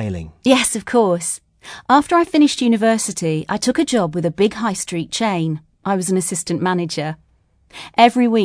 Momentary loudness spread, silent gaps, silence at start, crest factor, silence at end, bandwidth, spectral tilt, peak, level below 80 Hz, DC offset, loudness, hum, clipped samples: 12 LU; none; 0 s; 18 dB; 0 s; 11 kHz; -4.5 dB/octave; 0 dBFS; -52 dBFS; under 0.1%; -18 LUFS; none; under 0.1%